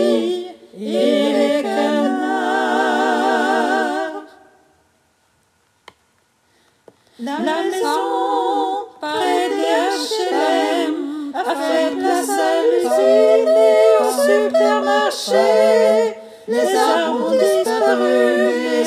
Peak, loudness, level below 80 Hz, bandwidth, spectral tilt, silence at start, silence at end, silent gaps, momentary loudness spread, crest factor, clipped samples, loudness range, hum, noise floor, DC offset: -2 dBFS; -17 LUFS; -74 dBFS; 15.5 kHz; -3 dB/octave; 0 s; 0 s; none; 10 LU; 14 dB; under 0.1%; 10 LU; none; -61 dBFS; under 0.1%